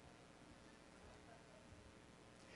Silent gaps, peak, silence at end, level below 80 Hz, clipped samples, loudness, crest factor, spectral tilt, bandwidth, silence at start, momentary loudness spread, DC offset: none; -48 dBFS; 0 s; -74 dBFS; under 0.1%; -63 LUFS; 16 dB; -4.5 dB/octave; 11.5 kHz; 0 s; 1 LU; under 0.1%